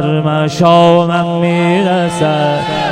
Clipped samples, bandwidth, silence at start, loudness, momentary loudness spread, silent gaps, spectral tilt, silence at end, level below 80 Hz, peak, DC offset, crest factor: 0.2%; 11 kHz; 0 s; -11 LUFS; 6 LU; none; -6.5 dB/octave; 0 s; -46 dBFS; 0 dBFS; under 0.1%; 10 dB